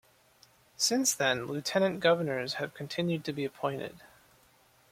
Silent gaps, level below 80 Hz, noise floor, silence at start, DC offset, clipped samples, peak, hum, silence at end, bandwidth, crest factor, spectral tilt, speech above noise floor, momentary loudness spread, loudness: none; -72 dBFS; -64 dBFS; 0.8 s; under 0.1%; under 0.1%; -10 dBFS; none; 0.85 s; 16.5 kHz; 22 dB; -3.5 dB/octave; 33 dB; 10 LU; -30 LUFS